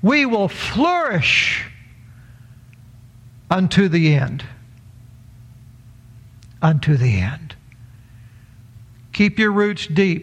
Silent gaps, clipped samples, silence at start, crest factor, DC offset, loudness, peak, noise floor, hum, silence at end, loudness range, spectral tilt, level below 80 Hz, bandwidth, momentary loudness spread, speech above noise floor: none; under 0.1%; 0 s; 18 dB; under 0.1%; -17 LUFS; -2 dBFS; -44 dBFS; none; 0 s; 3 LU; -6 dB/octave; -48 dBFS; 10.5 kHz; 15 LU; 27 dB